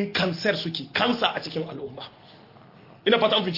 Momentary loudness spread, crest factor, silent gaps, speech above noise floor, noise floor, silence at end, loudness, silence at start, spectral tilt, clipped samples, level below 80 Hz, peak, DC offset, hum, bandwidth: 17 LU; 20 dB; none; 25 dB; -50 dBFS; 0 s; -24 LUFS; 0 s; -5.5 dB/octave; under 0.1%; -66 dBFS; -6 dBFS; under 0.1%; none; 5.8 kHz